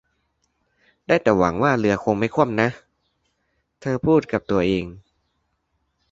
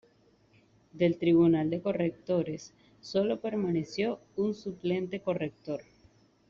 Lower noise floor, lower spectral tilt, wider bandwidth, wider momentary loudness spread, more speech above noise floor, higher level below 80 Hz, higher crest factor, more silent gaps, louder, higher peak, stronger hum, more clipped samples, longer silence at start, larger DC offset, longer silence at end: first, -72 dBFS vs -65 dBFS; about the same, -7 dB/octave vs -7 dB/octave; about the same, 7.8 kHz vs 7.2 kHz; second, 7 LU vs 13 LU; first, 52 dB vs 35 dB; first, -50 dBFS vs -66 dBFS; about the same, 20 dB vs 16 dB; neither; first, -20 LUFS vs -30 LUFS; first, -2 dBFS vs -14 dBFS; neither; neither; first, 1.1 s vs 0.95 s; neither; first, 1.1 s vs 0.65 s